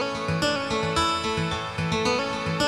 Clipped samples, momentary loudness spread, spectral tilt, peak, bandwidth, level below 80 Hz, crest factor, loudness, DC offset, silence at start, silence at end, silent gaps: under 0.1%; 4 LU; -4.5 dB/octave; -10 dBFS; 14 kHz; -46 dBFS; 16 dB; -25 LUFS; under 0.1%; 0 s; 0 s; none